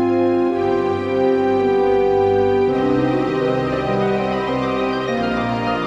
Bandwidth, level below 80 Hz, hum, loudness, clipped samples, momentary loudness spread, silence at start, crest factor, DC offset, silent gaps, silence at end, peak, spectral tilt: 8 kHz; -44 dBFS; none; -18 LUFS; under 0.1%; 4 LU; 0 s; 12 dB; under 0.1%; none; 0 s; -6 dBFS; -7.5 dB/octave